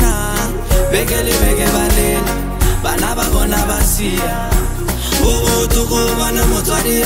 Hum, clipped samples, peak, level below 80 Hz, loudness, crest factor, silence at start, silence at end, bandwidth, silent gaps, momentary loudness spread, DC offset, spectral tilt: none; under 0.1%; 0 dBFS; -18 dBFS; -15 LUFS; 14 dB; 0 s; 0 s; 16.5 kHz; none; 4 LU; under 0.1%; -4 dB/octave